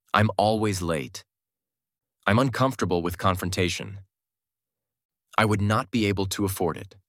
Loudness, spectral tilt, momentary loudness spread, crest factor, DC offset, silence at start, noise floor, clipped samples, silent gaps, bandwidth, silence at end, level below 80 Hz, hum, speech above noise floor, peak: -25 LUFS; -5.5 dB/octave; 8 LU; 24 dB; under 0.1%; 0.15 s; under -90 dBFS; under 0.1%; 5.05-5.09 s; 16.5 kHz; 0.2 s; -54 dBFS; none; over 66 dB; -2 dBFS